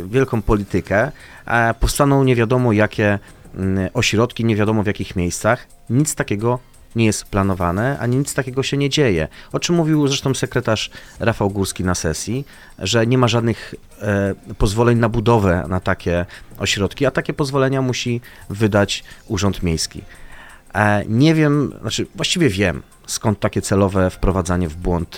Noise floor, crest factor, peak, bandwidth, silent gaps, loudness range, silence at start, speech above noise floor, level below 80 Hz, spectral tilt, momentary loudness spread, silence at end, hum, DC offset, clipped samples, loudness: -39 dBFS; 18 dB; 0 dBFS; 16.5 kHz; none; 3 LU; 0 s; 21 dB; -34 dBFS; -5.5 dB/octave; 9 LU; 0 s; none; under 0.1%; under 0.1%; -19 LUFS